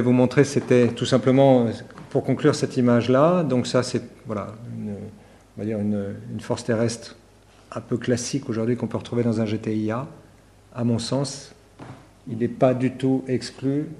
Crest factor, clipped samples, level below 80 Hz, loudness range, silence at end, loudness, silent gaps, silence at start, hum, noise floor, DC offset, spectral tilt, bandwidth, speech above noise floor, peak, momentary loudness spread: 20 dB; under 0.1%; -58 dBFS; 9 LU; 0.05 s; -23 LUFS; none; 0 s; none; -52 dBFS; under 0.1%; -6.5 dB/octave; 12 kHz; 30 dB; -4 dBFS; 18 LU